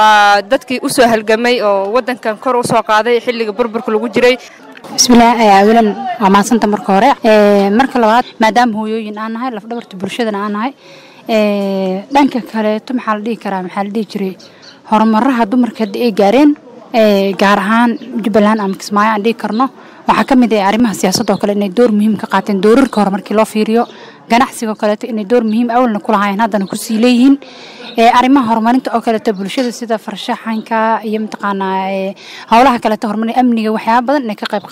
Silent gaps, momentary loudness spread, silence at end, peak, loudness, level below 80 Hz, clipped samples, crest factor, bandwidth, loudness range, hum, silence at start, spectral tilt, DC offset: none; 10 LU; 0 s; 0 dBFS; -12 LUFS; -46 dBFS; under 0.1%; 12 dB; 16 kHz; 6 LU; none; 0 s; -4.5 dB/octave; under 0.1%